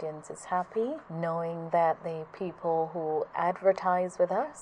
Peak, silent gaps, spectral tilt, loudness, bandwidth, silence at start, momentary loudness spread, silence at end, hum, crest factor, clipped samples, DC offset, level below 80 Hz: -12 dBFS; none; -6.5 dB/octave; -30 LUFS; 10.5 kHz; 0 s; 9 LU; 0 s; none; 18 dB; under 0.1%; under 0.1%; -72 dBFS